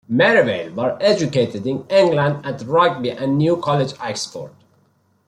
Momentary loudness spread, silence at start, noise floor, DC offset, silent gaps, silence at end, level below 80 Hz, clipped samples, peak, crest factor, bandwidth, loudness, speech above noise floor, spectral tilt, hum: 12 LU; 0.1 s; -60 dBFS; under 0.1%; none; 0.8 s; -60 dBFS; under 0.1%; -2 dBFS; 16 dB; 11 kHz; -18 LUFS; 42 dB; -5.5 dB/octave; none